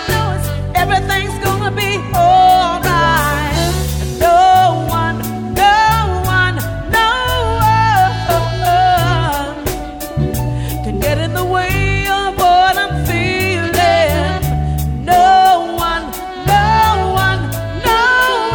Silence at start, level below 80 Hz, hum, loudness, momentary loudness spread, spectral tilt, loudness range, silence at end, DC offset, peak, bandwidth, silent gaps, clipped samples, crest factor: 0 s; -26 dBFS; none; -13 LUFS; 10 LU; -4.5 dB/octave; 3 LU; 0 s; under 0.1%; 0 dBFS; 20 kHz; none; under 0.1%; 12 dB